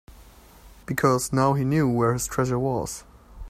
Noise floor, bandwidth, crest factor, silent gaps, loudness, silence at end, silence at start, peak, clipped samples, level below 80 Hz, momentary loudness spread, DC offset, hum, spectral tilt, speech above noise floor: -49 dBFS; 16 kHz; 18 dB; none; -24 LUFS; 0 s; 0.1 s; -6 dBFS; under 0.1%; -46 dBFS; 12 LU; under 0.1%; none; -6 dB/octave; 26 dB